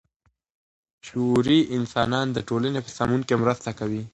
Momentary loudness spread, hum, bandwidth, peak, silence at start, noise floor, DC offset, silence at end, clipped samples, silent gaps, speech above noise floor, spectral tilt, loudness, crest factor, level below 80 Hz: 9 LU; none; 10.5 kHz; -6 dBFS; 1.05 s; -70 dBFS; under 0.1%; 0.05 s; under 0.1%; none; 47 dB; -6 dB/octave; -24 LUFS; 18 dB; -54 dBFS